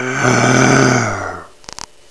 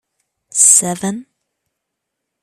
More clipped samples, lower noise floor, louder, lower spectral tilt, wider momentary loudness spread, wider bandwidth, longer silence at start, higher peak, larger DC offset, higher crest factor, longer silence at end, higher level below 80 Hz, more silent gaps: neither; second, -34 dBFS vs -77 dBFS; about the same, -12 LUFS vs -11 LUFS; first, -4.5 dB/octave vs -2.5 dB/octave; first, 21 LU vs 16 LU; second, 11 kHz vs over 20 kHz; second, 0 s vs 0.55 s; about the same, 0 dBFS vs 0 dBFS; first, 0.6% vs under 0.1%; about the same, 14 dB vs 18 dB; second, 0.65 s vs 1.2 s; first, -44 dBFS vs -64 dBFS; neither